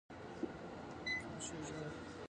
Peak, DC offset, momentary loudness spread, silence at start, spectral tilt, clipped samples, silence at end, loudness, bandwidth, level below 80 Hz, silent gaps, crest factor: -30 dBFS; under 0.1%; 8 LU; 0.1 s; -4 dB/octave; under 0.1%; 0 s; -45 LUFS; 11.5 kHz; -64 dBFS; none; 16 dB